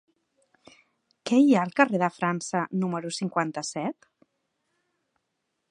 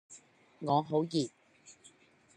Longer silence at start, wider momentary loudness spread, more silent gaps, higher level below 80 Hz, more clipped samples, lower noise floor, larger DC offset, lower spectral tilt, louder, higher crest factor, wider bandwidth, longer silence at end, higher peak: first, 1.25 s vs 0.1 s; second, 11 LU vs 25 LU; neither; about the same, -78 dBFS vs -78 dBFS; neither; first, -79 dBFS vs -63 dBFS; neither; about the same, -5.5 dB/octave vs -6.5 dB/octave; first, -25 LUFS vs -33 LUFS; about the same, 24 dB vs 20 dB; about the same, 10.5 kHz vs 10.5 kHz; first, 1.8 s vs 0.65 s; first, -4 dBFS vs -16 dBFS